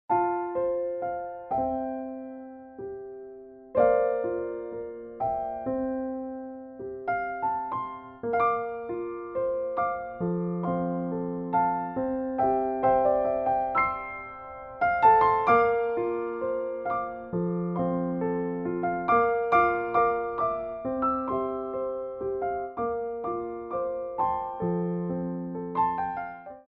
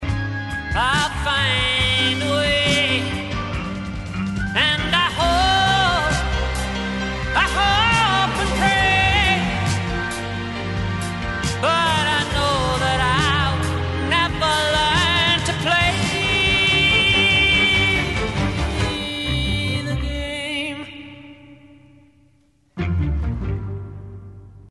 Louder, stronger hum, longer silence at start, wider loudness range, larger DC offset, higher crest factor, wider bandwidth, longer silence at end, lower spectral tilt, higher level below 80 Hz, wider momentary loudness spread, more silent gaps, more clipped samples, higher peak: second, -28 LUFS vs -19 LUFS; neither; about the same, 0.1 s vs 0 s; second, 7 LU vs 12 LU; neither; about the same, 20 dB vs 16 dB; second, 5.4 kHz vs 11.5 kHz; about the same, 0.05 s vs 0.05 s; first, -10 dB/octave vs -4 dB/octave; second, -56 dBFS vs -32 dBFS; first, 14 LU vs 11 LU; neither; neither; second, -8 dBFS vs -4 dBFS